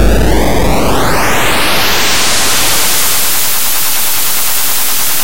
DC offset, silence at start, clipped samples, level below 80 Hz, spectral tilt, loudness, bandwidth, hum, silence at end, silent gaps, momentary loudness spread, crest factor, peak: 30%; 0 s; under 0.1%; -20 dBFS; -2 dB/octave; -10 LUFS; 17 kHz; none; 0 s; none; 3 LU; 10 dB; 0 dBFS